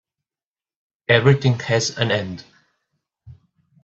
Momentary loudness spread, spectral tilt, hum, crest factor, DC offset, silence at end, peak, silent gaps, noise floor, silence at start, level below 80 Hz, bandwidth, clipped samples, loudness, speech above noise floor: 18 LU; -5 dB/octave; none; 22 dB; under 0.1%; 0.5 s; 0 dBFS; none; under -90 dBFS; 1.1 s; -54 dBFS; 8 kHz; under 0.1%; -18 LUFS; over 72 dB